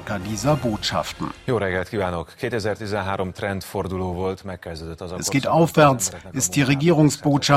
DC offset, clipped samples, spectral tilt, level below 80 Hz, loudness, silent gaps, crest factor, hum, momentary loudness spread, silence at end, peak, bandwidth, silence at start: under 0.1%; under 0.1%; -5 dB/octave; -50 dBFS; -22 LUFS; none; 20 dB; none; 12 LU; 0 s; 0 dBFS; 16 kHz; 0 s